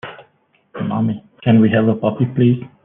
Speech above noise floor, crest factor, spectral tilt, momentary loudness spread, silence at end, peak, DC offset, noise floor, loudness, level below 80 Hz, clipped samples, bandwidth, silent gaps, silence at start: 43 dB; 14 dB; -11 dB/octave; 14 LU; 0.2 s; -2 dBFS; under 0.1%; -58 dBFS; -17 LUFS; -56 dBFS; under 0.1%; 3.7 kHz; none; 0.05 s